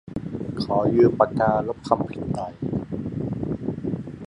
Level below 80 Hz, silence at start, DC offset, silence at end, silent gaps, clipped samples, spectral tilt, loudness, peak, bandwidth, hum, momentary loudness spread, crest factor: -48 dBFS; 0.05 s; under 0.1%; 0 s; none; under 0.1%; -8.5 dB/octave; -24 LUFS; -2 dBFS; 11 kHz; none; 12 LU; 22 dB